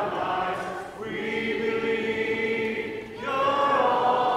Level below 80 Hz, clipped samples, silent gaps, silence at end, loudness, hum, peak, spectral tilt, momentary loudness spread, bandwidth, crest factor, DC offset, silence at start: -60 dBFS; under 0.1%; none; 0 s; -26 LUFS; none; -10 dBFS; -5 dB/octave; 12 LU; 13.5 kHz; 16 dB; under 0.1%; 0 s